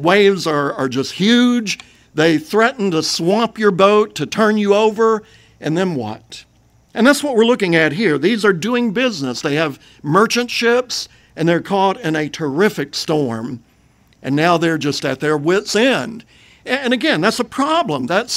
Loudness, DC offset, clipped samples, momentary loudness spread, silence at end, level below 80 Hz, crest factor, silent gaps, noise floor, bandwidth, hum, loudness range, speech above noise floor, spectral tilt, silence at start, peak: -16 LUFS; under 0.1%; under 0.1%; 11 LU; 0 s; -58 dBFS; 16 dB; none; -53 dBFS; 16 kHz; none; 3 LU; 37 dB; -4.5 dB/octave; 0 s; 0 dBFS